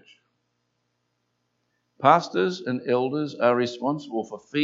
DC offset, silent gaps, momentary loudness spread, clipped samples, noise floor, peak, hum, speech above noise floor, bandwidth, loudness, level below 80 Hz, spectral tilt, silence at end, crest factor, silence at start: under 0.1%; none; 11 LU; under 0.1%; -75 dBFS; -2 dBFS; 60 Hz at -60 dBFS; 52 dB; 7.8 kHz; -24 LUFS; -78 dBFS; -6 dB/octave; 0 s; 24 dB; 2 s